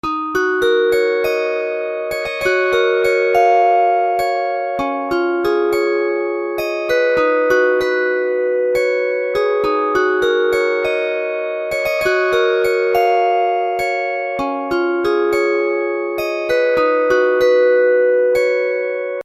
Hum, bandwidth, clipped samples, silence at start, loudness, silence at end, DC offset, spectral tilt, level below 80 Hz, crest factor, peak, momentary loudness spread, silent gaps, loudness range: none; 14.5 kHz; under 0.1%; 0.05 s; -16 LUFS; 0 s; under 0.1%; -4 dB/octave; -50 dBFS; 14 dB; -2 dBFS; 7 LU; none; 2 LU